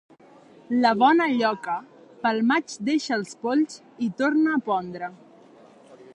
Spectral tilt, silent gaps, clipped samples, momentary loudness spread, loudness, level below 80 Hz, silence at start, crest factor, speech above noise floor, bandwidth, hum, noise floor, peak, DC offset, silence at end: -4.5 dB/octave; none; under 0.1%; 12 LU; -24 LUFS; -74 dBFS; 0.7 s; 18 dB; 28 dB; 11 kHz; none; -51 dBFS; -8 dBFS; under 0.1%; 0.1 s